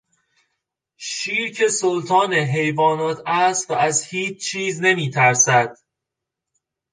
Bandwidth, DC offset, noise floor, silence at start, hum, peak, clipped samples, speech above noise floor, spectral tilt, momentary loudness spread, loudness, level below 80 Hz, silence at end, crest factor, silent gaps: 10.5 kHz; under 0.1%; -83 dBFS; 1 s; none; -2 dBFS; under 0.1%; 64 dB; -3 dB/octave; 9 LU; -19 LUFS; -68 dBFS; 1.2 s; 18 dB; none